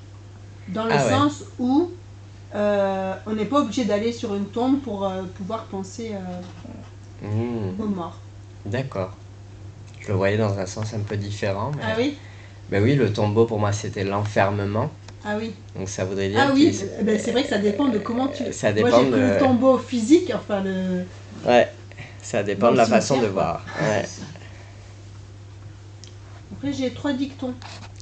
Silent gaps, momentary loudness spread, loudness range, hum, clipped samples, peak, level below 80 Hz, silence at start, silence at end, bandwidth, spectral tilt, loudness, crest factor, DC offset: none; 23 LU; 10 LU; none; under 0.1%; -2 dBFS; -52 dBFS; 0 s; 0 s; 9 kHz; -6 dB/octave; -23 LUFS; 20 dB; under 0.1%